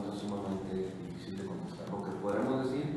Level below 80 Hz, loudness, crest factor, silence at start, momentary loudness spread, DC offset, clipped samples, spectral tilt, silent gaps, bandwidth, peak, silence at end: -64 dBFS; -37 LUFS; 14 dB; 0 s; 9 LU; under 0.1%; under 0.1%; -7 dB/octave; none; 12 kHz; -22 dBFS; 0 s